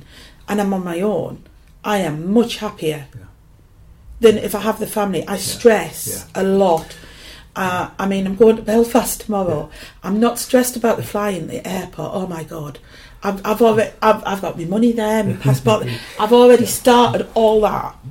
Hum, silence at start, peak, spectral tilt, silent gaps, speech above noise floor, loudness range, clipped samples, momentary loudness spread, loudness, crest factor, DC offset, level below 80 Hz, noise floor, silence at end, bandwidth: none; 0.15 s; 0 dBFS; -5 dB/octave; none; 30 dB; 6 LU; under 0.1%; 13 LU; -17 LUFS; 18 dB; under 0.1%; -44 dBFS; -47 dBFS; 0 s; 17 kHz